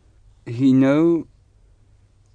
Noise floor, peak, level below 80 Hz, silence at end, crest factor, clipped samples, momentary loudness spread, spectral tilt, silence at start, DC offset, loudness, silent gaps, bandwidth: -54 dBFS; -8 dBFS; -54 dBFS; 1.1 s; 12 dB; under 0.1%; 10 LU; -8.5 dB/octave; 0.45 s; under 0.1%; -18 LUFS; none; 7.6 kHz